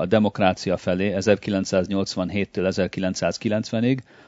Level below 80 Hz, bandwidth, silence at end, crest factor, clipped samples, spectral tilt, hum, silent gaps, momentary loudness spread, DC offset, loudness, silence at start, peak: -56 dBFS; 8 kHz; 0.25 s; 20 dB; under 0.1%; -6 dB/octave; none; none; 4 LU; under 0.1%; -23 LUFS; 0 s; -2 dBFS